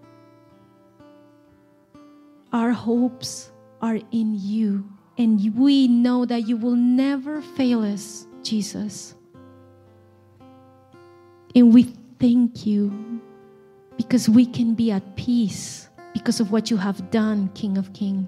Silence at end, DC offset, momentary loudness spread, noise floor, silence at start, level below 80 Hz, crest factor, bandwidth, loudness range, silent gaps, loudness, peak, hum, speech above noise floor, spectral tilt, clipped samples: 0 s; under 0.1%; 16 LU; -55 dBFS; 2.5 s; -64 dBFS; 18 dB; 12 kHz; 8 LU; none; -21 LUFS; -4 dBFS; none; 35 dB; -6 dB/octave; under 0.1%